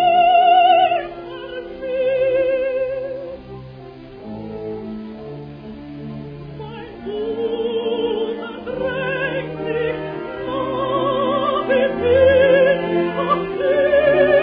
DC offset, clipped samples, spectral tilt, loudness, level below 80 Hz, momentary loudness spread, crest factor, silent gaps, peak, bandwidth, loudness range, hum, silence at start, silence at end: under 0.1%; under 0.1%; -8.5 dB/octave; -18 LUFS; -48 dBFS; 20 LU; 16 dB; none; -2 dBFS; 5.2 kHz; 15 LU; none; 0 s; 0 s